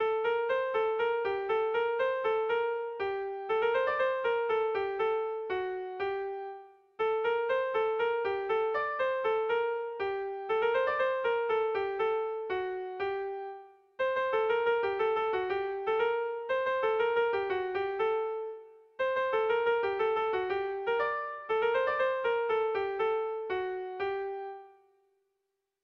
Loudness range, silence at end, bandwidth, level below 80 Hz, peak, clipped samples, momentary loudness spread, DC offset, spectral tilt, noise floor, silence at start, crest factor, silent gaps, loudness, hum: 3 LU; 1.1 s; 5.6 kHz; -70 dBFS; -18 dBFS; under 0.1%; 7 LU; under 0.1%; -5.5 dB/octave; -83 dBFS; 0 s; 14 dB; none; -31 LUFS; none